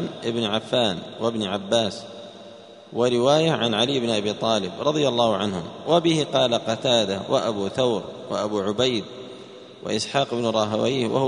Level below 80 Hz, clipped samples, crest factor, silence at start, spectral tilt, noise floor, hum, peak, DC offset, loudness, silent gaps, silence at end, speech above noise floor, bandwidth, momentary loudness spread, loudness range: -62 dBFS; under 0.1%; 18 dB; 0 s; -4.5 dB/octave; -44 dBFS; none; -4 dBFS; under 0.1%; -23 LUFS; none; 0 s; 21 dB; 10.5 kHz; 16 LU; 3 LU